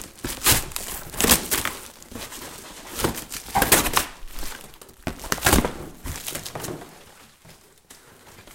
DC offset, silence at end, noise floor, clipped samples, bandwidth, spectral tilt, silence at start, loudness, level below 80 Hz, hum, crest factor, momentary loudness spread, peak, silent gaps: under 0.1%; 0 s; -51 dBFS; under 0.1%; 17 kHz; -2 dB/octave; 0 s; -22 LUFS; -38 dBFS; none; 26 dB; 20 LU; 0 dBFS; none